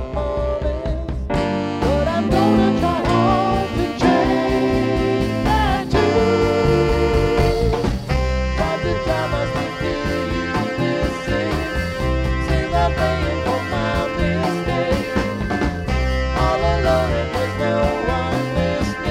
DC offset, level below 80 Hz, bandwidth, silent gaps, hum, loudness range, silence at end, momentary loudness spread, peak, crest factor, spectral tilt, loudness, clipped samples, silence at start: under 0.1%; -26 dBFS; 15 kHz; none; none; 4 LU; 0 s; 6 LU; -4 dBFS; 16 dB; -6.5 dB/octave; -19 LUFS; under 0.1%; 0 s